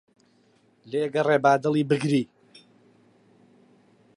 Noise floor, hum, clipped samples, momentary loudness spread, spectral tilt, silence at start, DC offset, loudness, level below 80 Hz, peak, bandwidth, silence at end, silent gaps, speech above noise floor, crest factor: -62 dBFS; none; under 0.1%; 10 LU; -6.5 dB/octave; 0.85 s; under 0.1%; -23 LUFS; -76 dBFS; -6 dBFS; 11 kHz; 1.9 s; none; 40 dB; 20 dB